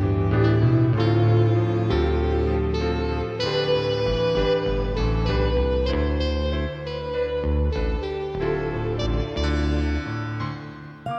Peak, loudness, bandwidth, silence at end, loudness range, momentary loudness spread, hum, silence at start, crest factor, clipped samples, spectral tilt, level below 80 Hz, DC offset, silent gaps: -8 dBFS; -23 LUFS; 7.2 kHz; 0 s; 4 LU; 9 LU; none; 0 s; 14 dB; under 0.1%; -7.5 dB/octave; -28 dBFS; under 0.1%; none